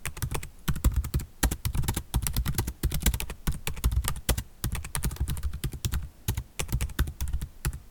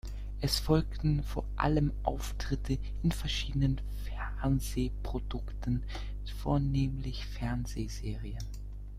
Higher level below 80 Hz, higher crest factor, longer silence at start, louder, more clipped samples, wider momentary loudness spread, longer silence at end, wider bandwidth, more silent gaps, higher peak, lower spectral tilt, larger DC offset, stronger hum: first, -32 dBFS vs -38 dBFS; about the same, 24 dB vs 20 dB; about the same, 0 s vs 0.05 s; first, -31 LUFS vs -34 LUFS; neither; second, 6 LU vs 11 LU; about the same, 0 s vs 0 s; first, 19 kHz vs 15 kHz; neither; first, -6 dBFS vs -12 dBFS; second, -4 dB/octave vs -6 dB/octave; neither; second, none vs 50 Hz at -35 dBFS